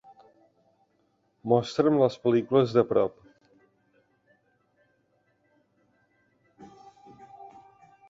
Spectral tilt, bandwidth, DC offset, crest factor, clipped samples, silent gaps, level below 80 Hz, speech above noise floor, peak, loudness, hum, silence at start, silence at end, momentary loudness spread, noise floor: -7.5 dB/octave; 7.8 kHz; under 0.1%; 22 dB; under 0.1%; none; -68 dBFS; 47 dB; -8 dBFS; -24 LUFS; none; 1.45 s; 0.6 s; 26 LU; -71 dBFS